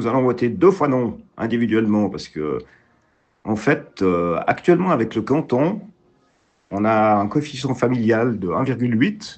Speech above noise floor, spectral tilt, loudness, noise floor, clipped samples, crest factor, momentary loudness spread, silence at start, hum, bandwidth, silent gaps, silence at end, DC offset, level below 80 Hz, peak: 43 dB; -7.5 dB/octave; -20 LUFS; -62 dBFS; under 0.1%; 18 dB; 10 LU; 0 s; none; 8.6 kHz; none; 0 s; under 0.1%; -56 dBFS; -2 dBFS